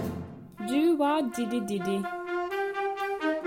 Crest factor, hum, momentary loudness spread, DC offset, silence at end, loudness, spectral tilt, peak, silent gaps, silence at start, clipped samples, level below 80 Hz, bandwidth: 14 dB; none; 11 LU; under 0.1%; 0 s; -29 LUFS; -5.5 dB/octave; -16 dBFS; none; 0 s; under 0.1%; -64 dBFS; 16.5 kHz